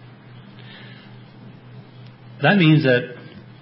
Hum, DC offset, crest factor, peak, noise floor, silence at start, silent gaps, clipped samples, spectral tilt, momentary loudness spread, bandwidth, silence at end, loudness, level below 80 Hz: none; under 0.1%; 18 dB; -4 dBFS; -43 dBFS; 0.35 s; none; under 0.1%; -11.5 dB/octave; 27 LU; 5.8 kHz; 0.4 s; -17 LUFS; -64 dBFS